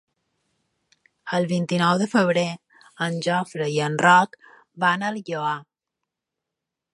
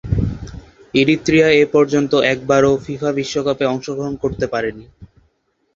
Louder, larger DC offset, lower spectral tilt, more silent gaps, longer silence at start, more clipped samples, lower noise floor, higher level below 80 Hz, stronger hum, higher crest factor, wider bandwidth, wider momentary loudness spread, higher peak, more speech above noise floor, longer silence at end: second, -22 LUFS vs -17 LUFS; neither; about the same, -5 dB/octave vs -5.5 dB/octave; neither; first, 1.25 s vs 0.05 s; neither; first, -85 dBFS vs -64 dBFS; second, -72 dBFS vs -36 dBFS; neither; first, 22 dB vs 16 dB; first, 11.5 kHz vs 7.6 kHz; about the same, 13 LU vs 11 LU; about the same, -2 dBFS vs 0 dBFS; first, 63 dB vs 48 dB; first, 1.3 s vs 0.7 s